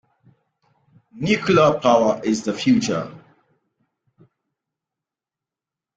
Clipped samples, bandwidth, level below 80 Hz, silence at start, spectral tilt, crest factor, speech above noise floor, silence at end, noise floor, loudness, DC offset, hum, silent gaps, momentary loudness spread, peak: under 0.1%; 9.2 kHz; -58 dBFS; 1.15 s; -5.5 dB/octave; 20 dB; 70 dB; 2.8 s; -88 dBFS; -19 LUFS; under 0.1%; none; none; 12 LU; -4 dBFS